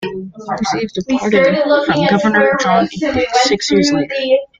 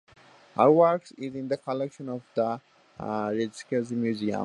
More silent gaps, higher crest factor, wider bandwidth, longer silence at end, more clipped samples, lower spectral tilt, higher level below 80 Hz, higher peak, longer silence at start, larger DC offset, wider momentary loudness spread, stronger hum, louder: neither; second, 14 dB vs 20 dB; second, 9.4 kHz vs 11 kHz; first, 0.15 s vs 0 s; neither; second, -4.5 dB/octave vs -7 dB/octave; first, -48 dBFS vs -68 dBFS; first, 0 dBFS vs -6 dBFS; second, 0 s vs 0.55 s; neither; second, 8 LU vs 16 LU; neither; first, -14 LUFS vs -27 LUFS